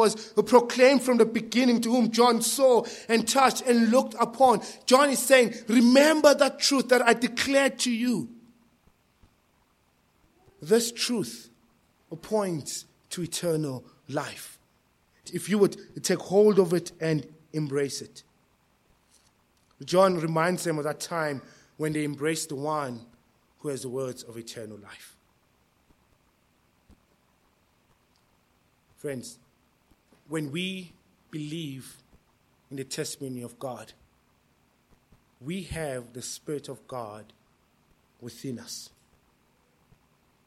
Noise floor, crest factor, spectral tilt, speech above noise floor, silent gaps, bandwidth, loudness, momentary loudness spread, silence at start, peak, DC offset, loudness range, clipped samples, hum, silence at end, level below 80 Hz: -67 dBFS; 24 dB; -4 dB/octave; 42 dB; none; 15.5 kHz; -25 LUFS; 20 LU; 0 s; -4 dBFS; under 0.1%; 18 LU; under 0.1%; none; 1.6 s; -66 dBFS